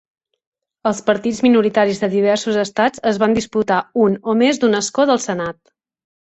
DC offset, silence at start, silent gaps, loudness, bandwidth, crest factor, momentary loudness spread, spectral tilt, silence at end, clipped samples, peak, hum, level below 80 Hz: under 0.1%; 0.85 s; none; -17 LUFS; 8.4 kHz; 16 dB; 6 LU; -4.5 dB/octave; 0.85 s; under 0.1%; -2 dBFS; none; -56 dBFS